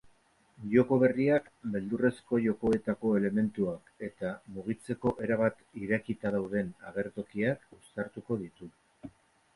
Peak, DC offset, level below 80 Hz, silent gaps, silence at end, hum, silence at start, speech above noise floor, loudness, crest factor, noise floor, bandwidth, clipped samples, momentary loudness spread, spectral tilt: -12 dBFS; under 0.1%; -62 dBFS; none; 0.45 s; none; 0.6 s; 35 dB; -31 LUFS; 20 dB; -66 dBFS; 11.5 kHz; under 0.1%; 17 LU; -8.5 dB/octave